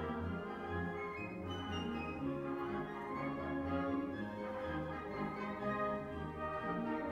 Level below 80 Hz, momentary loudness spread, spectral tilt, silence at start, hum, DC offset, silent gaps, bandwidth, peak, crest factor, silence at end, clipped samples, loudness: -58 dBFS; 5 LU; -7.5 dB/octave; 0 s; none; under 0.1%; none; 12 kHz; -26 dBFS; 16 dB; 0 s; under 0.1%; -41 LUFS